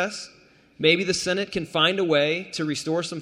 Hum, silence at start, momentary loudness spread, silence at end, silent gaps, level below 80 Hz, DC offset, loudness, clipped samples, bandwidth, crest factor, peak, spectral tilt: none; 0 s; 9 LU; 0 s; none; -60 dBFS; under 0.1%; -23 LUFS; under 0.1%; 15 kHz; 20 dB; -4 dBFS; -3.5 dB/octave